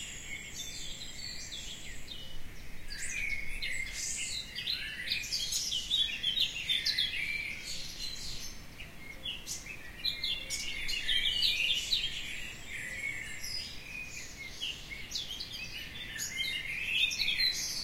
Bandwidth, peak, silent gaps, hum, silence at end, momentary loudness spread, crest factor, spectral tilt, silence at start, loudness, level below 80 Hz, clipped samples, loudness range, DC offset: 16 kHz; -16 dBFS; none; none; 0 s; 14 LU; 20 dB; 0 dB/octave; 0 s; -33 LUFS; -50 dBFS; under 0.1%; 8 LU; under 0.1%